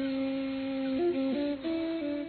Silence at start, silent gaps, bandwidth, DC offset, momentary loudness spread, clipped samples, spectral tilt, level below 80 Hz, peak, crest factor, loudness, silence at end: 0 s; none; 4.5 kHz; under 0.1%; 4 LU; under 0.1%; -4 dB/octave; -62 dBFS; -22 dBFS; 10 dB; -32 LUFS; 0 s